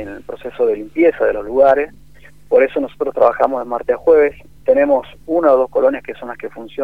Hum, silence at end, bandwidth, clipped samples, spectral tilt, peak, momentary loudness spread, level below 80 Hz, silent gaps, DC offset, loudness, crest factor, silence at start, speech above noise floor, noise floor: none; 0 s; 4.7 kHz; under 0.1%; -7 dB/octave; 0 dBFS; 16 LU; -46 dBFS; none; 0.8%; -15 LUFS; 16 dB; 0 s; 27 dB; -43 dBFS